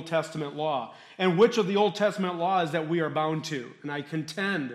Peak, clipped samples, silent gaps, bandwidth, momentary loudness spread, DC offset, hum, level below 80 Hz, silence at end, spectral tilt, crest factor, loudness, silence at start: -10 dBFS; under 0.1%; none; 13.5 kHz; 12 LU; under 0.1%; none; -76 dBFS; 0 s; -5.5 dB/octave; 18 dB; -27 LUFS; 0 s